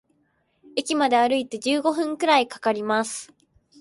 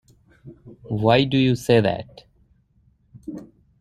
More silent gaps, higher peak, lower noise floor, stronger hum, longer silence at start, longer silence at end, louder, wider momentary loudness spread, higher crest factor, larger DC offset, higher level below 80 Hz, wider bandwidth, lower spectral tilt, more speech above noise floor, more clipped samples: neither; second, -6 dBFS vs -2 dBFS; first, -68 dBFS vs -61 dBFS; neither; first, 0.75 s vs 0.45 s; first, 0.55 s vs 0.35 s; second, -23 LUFS vs -20 LUFS; second, 10 LU vs 23 LU; about the same, 18 dB vs 20 dB; neither; second, -72 dBFS vs -54 dBFS; second, 12 kHz vs 14 kHz; second, -3 dB/octave vs -6.5 dB/octave; first, 46 dB vs 42 dB; neither